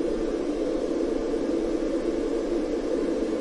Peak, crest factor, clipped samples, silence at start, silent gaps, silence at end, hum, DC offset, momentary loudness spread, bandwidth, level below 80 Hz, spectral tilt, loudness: -14 dBFS; 12 dB; under 0.1%; 0 s; none; 0 s; none; under 0.1%; 1 LU; 11 kHz; -42 dBFS; -6 dB/octave; -27 LUFS